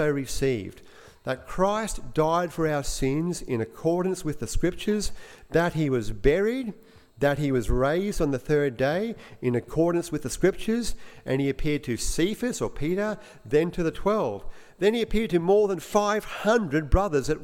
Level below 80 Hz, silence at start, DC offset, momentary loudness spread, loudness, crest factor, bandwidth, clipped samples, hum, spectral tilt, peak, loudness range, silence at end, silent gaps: -36 dBFS; 0 s; under 0.1%; 8 LU; -26 LUFS; 20 dB; 16.5 kHz; under 0.1%; none; -5.5 dB/octave; -6 dBFS; 3 LU; 0 s; none